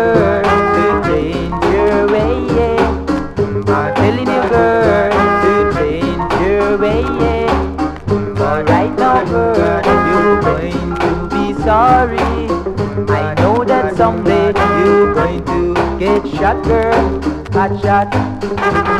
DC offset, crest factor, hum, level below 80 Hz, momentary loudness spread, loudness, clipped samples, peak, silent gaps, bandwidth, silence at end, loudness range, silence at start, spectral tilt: under 0.1%; 12 dB; none; -28 dBFS; 6 LU; -13 LUFS; under 0.1%; 0 dBFS; none; 11.5 kHz; 0 s; 2 LU; 0 s; -7 dB/octave